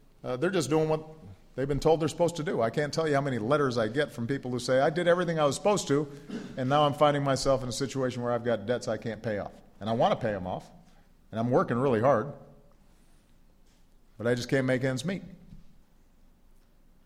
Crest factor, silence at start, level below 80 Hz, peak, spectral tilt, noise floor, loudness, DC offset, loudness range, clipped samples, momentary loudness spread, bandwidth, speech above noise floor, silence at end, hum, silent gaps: 18 dB; 0.25 s; -54 dBFS; -10 dBFS; -5.5 dB/octave; -58 dBFS; -28 LUFS; under 0.1%; 6 LU; under 0.1%; 12 LU; 15.5 kHz; 31 dB; 1.35 s; none; none